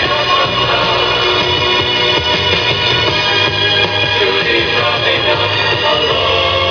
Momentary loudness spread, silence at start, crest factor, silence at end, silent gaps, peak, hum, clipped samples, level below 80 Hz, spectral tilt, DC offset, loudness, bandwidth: 1 LU; 0 s; 12 dB; 0 s; none; 0 dBFS; none; under 0.1%; -38 dBFS; -4 dB/octave; under 0.1%; -11 LUFS; 5.4 kHz